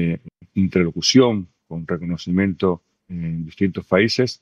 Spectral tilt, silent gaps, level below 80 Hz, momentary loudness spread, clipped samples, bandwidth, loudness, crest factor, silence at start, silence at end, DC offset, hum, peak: -5.5 dB/octave; none; -54 dBFS; 15 LU; under 0.1%; 8.4 kHz; -20 LUFS; 18 dB; 0 s; 0.05 s; under 0.1%; none; -2 dBFS